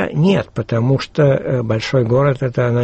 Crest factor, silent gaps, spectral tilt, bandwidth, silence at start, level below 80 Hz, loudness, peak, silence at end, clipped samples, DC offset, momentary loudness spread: 12 dB; none; -7.5 dB/octave; 8.2 kHz; 0 s; -44 dBFS; -16 LUFS; -4 dBFS; 0 s; under 0.1%; under 0.1%; 4 LU